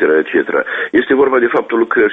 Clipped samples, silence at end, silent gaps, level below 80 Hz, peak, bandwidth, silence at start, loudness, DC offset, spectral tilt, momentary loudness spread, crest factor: under 0.1%; 0 s; none; -54 dBFS; 0 dBFS; 3.9 kHz; 0 s; -13 LUFS; under 0.1%; -7.5 dB/octave; 4 LU; 12 dB